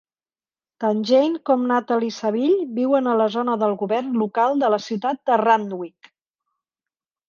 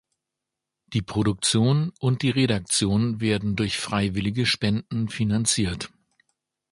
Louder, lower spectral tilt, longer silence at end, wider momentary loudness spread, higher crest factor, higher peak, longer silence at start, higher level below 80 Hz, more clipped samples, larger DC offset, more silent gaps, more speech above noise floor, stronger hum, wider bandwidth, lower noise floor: first, -20 LUFS vs -24 LUFS; first, -6 dB/octave vs -4.5 dB/octave; first, 1.4 s vs 0.85 s; about the same, 6 LU vs 7 LU; about the same, 16 dB vs 18 dB; first, -4 dBFS vs -8 dBFS; about the same, 0.8 s vs 0.9 s; second, -74 dBFS vs -48 dBFS; neither; neither; neither; first, over 70 dB vs 62 dB; neither; second, 7.2 kHz vs 11.5 kHz; first, under -90 dBFS vs -85 dBFS